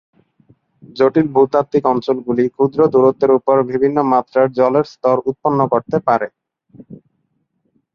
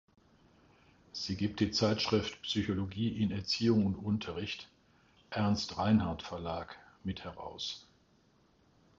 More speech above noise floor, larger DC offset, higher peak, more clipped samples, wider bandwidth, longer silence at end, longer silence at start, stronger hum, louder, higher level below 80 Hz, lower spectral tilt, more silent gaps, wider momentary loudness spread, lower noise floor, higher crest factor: first, 52 dB vs 35 dB; neither; first, 0 dBFS vs -16 dBFS; neither; second, 6.6 kHz vs 7.6 kHz; second, 1 s vs 1.15 s; second, 0.95 s vs 1.15 s; neither; first, -15 LUFS vs -34 LUFS; about the same, -58 dBFS vs -56 dBFS; first, -8.5 dB/octave vs -5.5 dB/octave; neither; second, 5 LU vs 14 LU; about the same, -67 dBFS vs -68 dBFS; about the same, 16 dB vs 20 dB